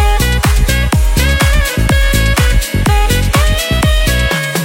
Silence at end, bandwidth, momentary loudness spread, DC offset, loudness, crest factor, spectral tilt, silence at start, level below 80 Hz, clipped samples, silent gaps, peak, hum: 0 s; 17 kHz; 2 LU; under 0.1%; -12 LUFS; 10 dB; -4.5 dB/octave; 0 s; -12 dBFS; under 0.1%; none; 0 dBFS; none